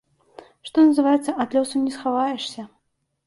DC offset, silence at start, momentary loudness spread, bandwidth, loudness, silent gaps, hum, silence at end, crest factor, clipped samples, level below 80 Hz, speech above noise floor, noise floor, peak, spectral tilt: under 0.1%; 0.65 s; 15 LU; 11.5 kHz; -21 LUFS; none; none; 0.6 s; 16 dB; under 0.1%; -68 dBFS; 52 dB; -72 dBFS; -8 dBFS; -4 dB/octave